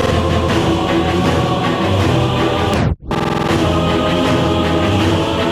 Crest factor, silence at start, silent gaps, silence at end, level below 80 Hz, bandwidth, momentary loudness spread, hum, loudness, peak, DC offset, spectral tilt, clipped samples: 12 dB; 0 s; none; 0 s; -30 dBFS; 15.5 kHz; 2 LU; none; -15 LUFS; -2 dBFS; under 0.1%; -6 dB/octave; under 0.1%